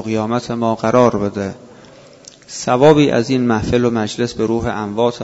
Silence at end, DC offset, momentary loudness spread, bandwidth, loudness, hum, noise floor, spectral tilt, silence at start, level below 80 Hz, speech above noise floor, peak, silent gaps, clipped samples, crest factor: 0 s; under 0.1%; 11 LU; 8 kHz; -16 LUFS; none; -42 dBFS; -6 dB/octave; 0 s; -42 dBFS; 26 dB; 0 dBFS; none; under 0.1%; 16 dB